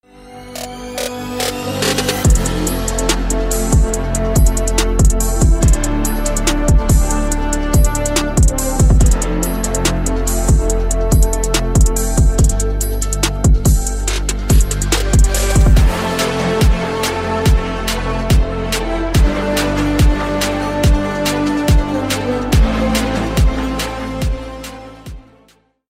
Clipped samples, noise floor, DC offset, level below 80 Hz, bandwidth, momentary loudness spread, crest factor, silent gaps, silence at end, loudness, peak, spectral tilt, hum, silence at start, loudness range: under 0.1%; -53 dBFS; under 0.1%; -16 dBFS; 16 kHz; 7 LU; 14 dB; none; 0.7 s; -16 LUFS; 0 dBFS; -4.5 dB/octave; none; 0.2 s; 2 LU